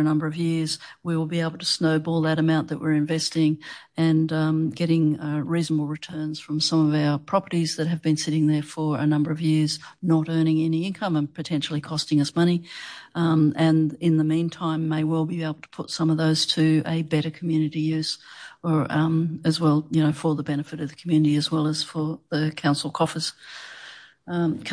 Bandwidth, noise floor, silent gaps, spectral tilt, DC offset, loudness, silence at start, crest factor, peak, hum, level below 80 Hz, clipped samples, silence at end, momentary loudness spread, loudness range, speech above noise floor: 10.5 kHz; -45 dBFS; none; -6 dB/octave; under 0.1%; -24 LUFS; 0 s; 14 dB; -8 dBFS; none; -68 dBFS; under 0.1%; 0 s; 10 LU; 2 LU; 22 dB